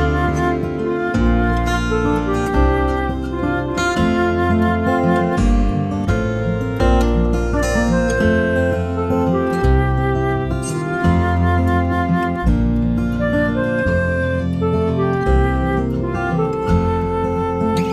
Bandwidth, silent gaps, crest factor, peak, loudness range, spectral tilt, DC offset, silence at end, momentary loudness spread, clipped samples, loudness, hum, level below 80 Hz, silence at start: 13.5 kHz; none; 14 dB; -4 dBFS; 1 LU; -7 dB/octave; under 0.1%; 0 s; 4 LU; under 0.1%; -18 LUFS; none; -24 dBFS; 0 s